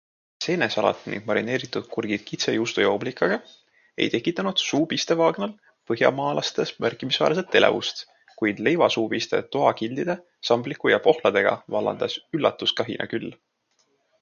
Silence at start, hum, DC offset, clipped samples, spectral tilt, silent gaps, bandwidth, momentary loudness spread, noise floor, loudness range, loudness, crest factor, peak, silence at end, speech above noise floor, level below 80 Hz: 0.4 s; none; under 0.1%; under 0.1%; -4.5 dB/octave; none; 7.2 kHz; 10 LU; -69 dBFS; 3 LU; -24 LUFS; 24 dB; 0 dBFS; 0.85 s; 46 dB; -68 dBFS